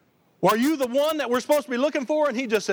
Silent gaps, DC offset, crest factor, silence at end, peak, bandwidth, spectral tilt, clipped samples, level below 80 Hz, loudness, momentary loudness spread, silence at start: none; under 0.1%; 16 dB; 0 s; -8 dBFS; over 20 kHz; -4.5 dB/octave; under 0.1%; -70 dBFS; -23 LUFS; 4 LU; 0.4 s